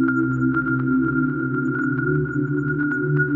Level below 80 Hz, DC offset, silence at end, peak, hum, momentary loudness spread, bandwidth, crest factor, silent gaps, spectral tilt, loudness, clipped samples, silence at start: -48 dBFS; under 0.1%; 0 s; -8 dBFS; none; 3 LU; 7.2 kHz; 12 dB; none; -11 dB/octave; -21 LUFS; under 0.1%; 0 s